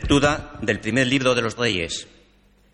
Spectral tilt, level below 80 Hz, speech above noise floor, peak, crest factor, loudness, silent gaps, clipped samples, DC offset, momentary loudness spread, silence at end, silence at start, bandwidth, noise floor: -4.5 dB/octave; -40 dBFS; 36 dB; -6 dBFS; 16 dB; -21 LUFS; none; under 0.1%; under 0.1%; 8 LU; 0.7 s; 0 s; 11 kHz; -57 dBFS